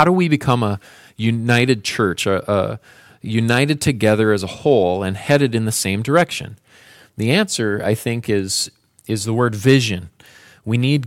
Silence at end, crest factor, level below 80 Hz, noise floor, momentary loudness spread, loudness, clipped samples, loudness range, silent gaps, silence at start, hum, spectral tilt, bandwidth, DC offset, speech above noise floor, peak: 0 s; 18 dB; -52 dBFS; -47 dBFS; 10 LU; -18 LUFS; under 0.1%; 3 LU; none; 0 s; none; -5 dB/octave; 16 kHz; under 0.1%; 30 dB; -2 dBFS